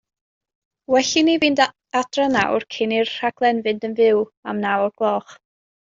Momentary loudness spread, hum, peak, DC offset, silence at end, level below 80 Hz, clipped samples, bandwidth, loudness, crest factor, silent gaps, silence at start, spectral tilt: 7 LU; none; -2 dBFS; under 0.1%; 0.55 s; -62 dBFS; under 0.1%; 7.8 kHz; -20 LUFS; 18 dB; 4.37-4.43 s; 0.9 s; -3.5 dB/octave